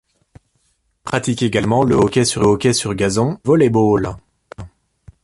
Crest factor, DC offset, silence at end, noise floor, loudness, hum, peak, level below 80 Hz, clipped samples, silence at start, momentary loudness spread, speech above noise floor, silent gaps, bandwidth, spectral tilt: 14 dB; under 0.1%; 0.55 s; -64 dBFS; -16 LUFS; none; -2 dBFS; -42 dBFS; under 0.1%; 1.05 s; 21 LU; 49 dB; none; 11.5 kHz; -5.5 dB/octave